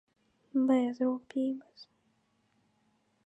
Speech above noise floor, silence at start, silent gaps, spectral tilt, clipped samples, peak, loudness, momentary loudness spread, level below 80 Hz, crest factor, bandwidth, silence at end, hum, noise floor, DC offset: 43 dB; 0.55 s; none; -6.5 dB/octave; under 0.1%; -16 dBFS; -31 LUFS; 8 LU; -86 dBFS; 18 dB; 8 kHz; 1.45 s; none; -73 dBFS; under 0.1%